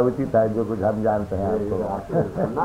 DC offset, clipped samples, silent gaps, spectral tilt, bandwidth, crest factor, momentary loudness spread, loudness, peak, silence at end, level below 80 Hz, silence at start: under 0.1%; under 0.1%; none; -9.5 dB/octave; 15.5 kHz; 16 dB; 4 LU; -23 LUFS; -6 dBFS; 0 s; -44 dBFS; 0 s